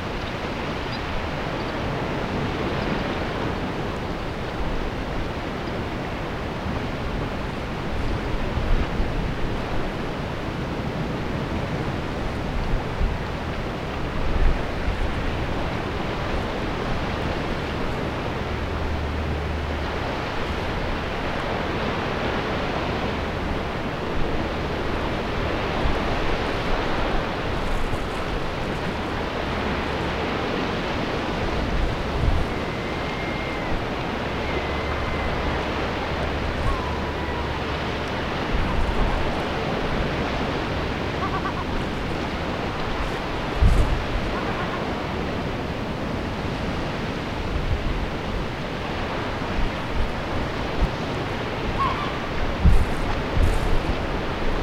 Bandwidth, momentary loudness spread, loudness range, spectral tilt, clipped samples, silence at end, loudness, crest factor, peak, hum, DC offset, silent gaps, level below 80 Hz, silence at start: 14 kHz; 4 LU; 2 LU; -6 dB/octave; under 0.1%; 0 s; -26 LUFS; 20 dB; -6 dBFS; none; under 0.1%; none; -30 dBFS; 0 s